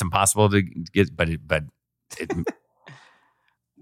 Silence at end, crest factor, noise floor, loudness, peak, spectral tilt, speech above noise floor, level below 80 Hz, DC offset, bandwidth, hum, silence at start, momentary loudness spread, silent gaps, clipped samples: 0.9 s; 22 dB; -69 dBFS; -23 LUFS; -4 dBFS; -4.5 dB/octave; 47 dB; -46 dBFS; under 0.1%; 16.5 kHz; none; 0 s; 16 LU; none; under 0.1%